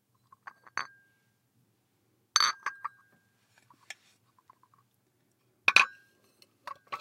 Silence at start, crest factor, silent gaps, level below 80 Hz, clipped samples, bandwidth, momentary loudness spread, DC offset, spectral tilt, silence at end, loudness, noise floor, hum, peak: 0.75 s; 34 dB; none; under -90 dBFS; under 0.1%; 16 kHz; 26 LU; under 0.1%; 1.5 dB/octave; 0 s; -27 LUFS; -73 dBFS; none; -2 dBFS